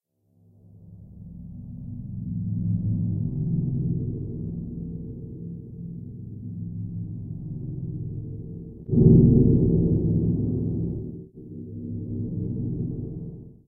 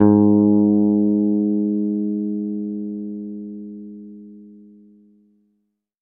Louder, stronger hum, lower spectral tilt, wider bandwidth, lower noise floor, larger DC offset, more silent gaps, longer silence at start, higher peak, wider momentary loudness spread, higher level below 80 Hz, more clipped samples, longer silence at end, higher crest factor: second, -25 LUFS vs -19 LUFS; neither; first, -17 dB/octave vs -15.5 dB/octave; second, 1.1 kHz vs 1.8 kHz; second, -61 dBFS vs -71 dBFS; neither; neither; first, 0.75 s vs 0 s; second, -4 dBFS vs 0 dBFS; second, 19 LU vs 22 LU; first, -38 dBFS vs -62 dBFS; neither; second, 0.15 s vs 1.5 s; about the same, 22 dB vs 20 dB